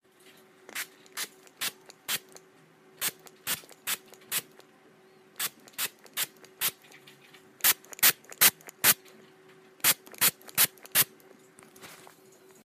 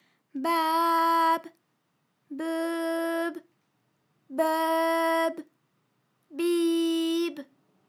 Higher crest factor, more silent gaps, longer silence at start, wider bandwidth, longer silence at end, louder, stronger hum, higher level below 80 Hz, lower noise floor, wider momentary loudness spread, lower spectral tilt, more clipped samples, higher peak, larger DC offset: first, 26 dB vs 16 dB; neither; first, 0.75 s vs 0.35 s; about the same, 16 kHz vs 17.5 kHz; first, 0.7 s vs 0.45 s; about the same, -27 LUFS vs -27 LUFS; neither; first, -76 dBFS vs under -90 dBFS; second, -58 dBFS vs -74 dBFS; about the same, 15 LU vs 16 LU; second, 1 dB/octave vs -2 dB/octave; neither; first, -6 dBFS vs -12 dBFS; neither